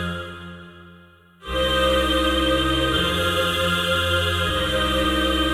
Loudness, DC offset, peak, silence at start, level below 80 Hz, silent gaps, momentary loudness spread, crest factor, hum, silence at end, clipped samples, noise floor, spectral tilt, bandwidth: -20 LUFS; under 0.1%; -8 dBFS; 0 s; -32 dBFS; none; 14 LU; 14 dB; none; 0 s; under 0.1%; -50 dBFS; -4 dB/octave; 16.5 kHz